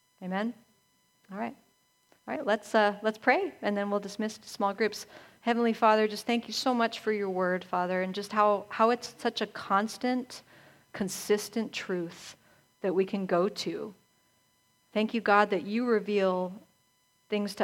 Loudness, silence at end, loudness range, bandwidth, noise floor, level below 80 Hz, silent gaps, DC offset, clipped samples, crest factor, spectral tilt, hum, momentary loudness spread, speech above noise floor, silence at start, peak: -29 LUFS; 0 s; 5 LU; 16.5 kHz; -70 dBFS; -76 dBFS; none; under 0.1%; under 0.1%; 22 dB; -4.5 dB/octave; none; 13 LU; 41 dB; 0.2 s; -8 dBFS